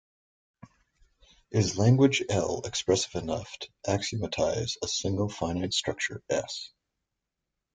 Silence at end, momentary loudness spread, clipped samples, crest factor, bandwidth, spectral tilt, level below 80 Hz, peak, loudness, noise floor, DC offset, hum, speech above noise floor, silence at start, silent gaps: 1.1 s; 12 LU; under 0.1%; 20 dB; 9.6 kHz; -4.5 dB/octave; -58 dBFS; -10 dBFS; -28 LUFS; -85 dBFS; under 0.1%; none; 57 dB; 1.5 s; none